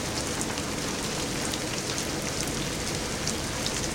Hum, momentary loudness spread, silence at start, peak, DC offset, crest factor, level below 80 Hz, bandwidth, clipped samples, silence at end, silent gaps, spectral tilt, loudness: none; 1 LU; 0 s; -8 dBFS; under 0.1%; 22 dB; -44 dBFS; 16.5 kHz; under 0.1%; 0 s; none; -3 dB/octave; -29 LUFS